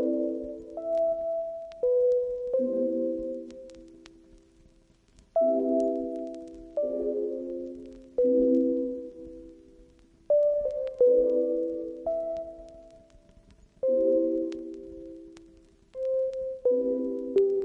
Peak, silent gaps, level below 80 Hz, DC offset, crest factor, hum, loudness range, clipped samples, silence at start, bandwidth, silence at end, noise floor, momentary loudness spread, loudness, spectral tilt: -14 dBFS; none; -60 dBFS; under 0.1%; 16 dB; none; 4 LU; under 0.1%; 0 s; 6.2 kHz; 0 s; -61 dBFS; 19 LU; -28 LUFS; -8 dB/octave